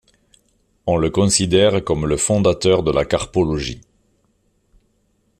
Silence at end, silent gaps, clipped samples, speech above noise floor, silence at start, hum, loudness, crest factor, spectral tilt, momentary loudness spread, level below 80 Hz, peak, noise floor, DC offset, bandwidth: 1.6 s; none; under 0.1%; 47 dB; 0.85 s; none; -18 LUFS; 18 dB; -4.5 dB/octave; 9 LU; -40 dBFS; -2 dBFS; -64 dBFS; under 0.1%; 13 kHz